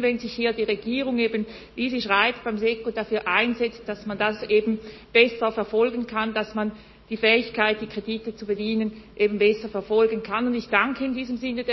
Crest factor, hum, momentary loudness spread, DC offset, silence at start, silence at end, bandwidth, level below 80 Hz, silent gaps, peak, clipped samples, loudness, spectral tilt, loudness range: 22 dB; none; 10 LU; under 0.1%; 0 s; 0 s; 6 kHz; -54 dBFS; none; -2 dBFS; under 0.1%; -24 LUFS; -6 dB/octave; 2 LU